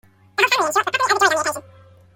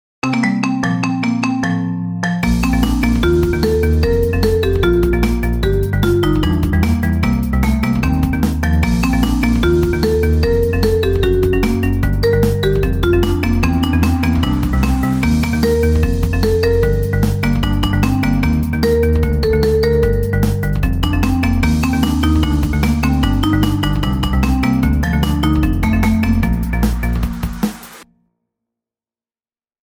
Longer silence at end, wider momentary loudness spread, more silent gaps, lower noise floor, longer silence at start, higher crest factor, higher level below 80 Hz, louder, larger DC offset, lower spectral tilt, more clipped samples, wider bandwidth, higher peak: second, 0.55 s vs 1.8 s; first, 11 LU vs 3 LU; neither; second, -48 dBFS vs under -90 dBFS; first, 0.4 s vs 0.25 s; first, 18 dB vs 12 dB; second, -64 dBFS vs -20 dBFS; about the same, -18 LUFS vs -16 LUFS; neither; second, -1 dB/octave vs -7 dB/octave; neither; about the same, 17 kHz vs 17 kHz; about the same, -2 dBFS vs -2 dBFS